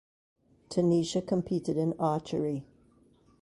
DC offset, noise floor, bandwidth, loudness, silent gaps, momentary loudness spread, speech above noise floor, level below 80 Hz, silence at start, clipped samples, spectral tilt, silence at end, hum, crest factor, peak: under 0.1%; -63 dBFS; 11.5 kHz; -30 LUFS; none; 8 LU; 34 dB; -64 dBFS; 0.7 s; under 0.1%; -7 dB/octave; 0.8 s; none; 16 dB; -14 dBFS